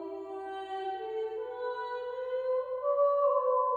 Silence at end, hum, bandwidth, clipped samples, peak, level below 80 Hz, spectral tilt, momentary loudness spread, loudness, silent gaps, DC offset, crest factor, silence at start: 0 s; 60 Hz at -75 dBFS; 4.9 kHz; under 0.1%; -18 dBFS; -76 dBFS; -5 dB/octave; 12 LU; -32 LUFS; none; under 0.1%; 14 dB; 0 s